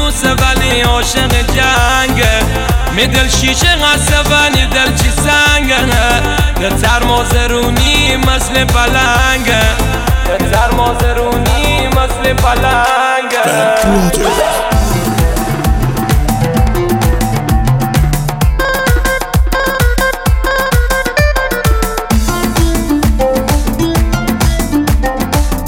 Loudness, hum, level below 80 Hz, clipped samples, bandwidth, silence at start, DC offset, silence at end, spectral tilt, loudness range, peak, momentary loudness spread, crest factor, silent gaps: -11 LUFS; none; -16 dBFS; under 0.1%; 17 kHz; 0 s; under 0.1%; 0 s; -4 dB/octave; 3 LU; 0 dBFS; 5 LU; 10 dB; none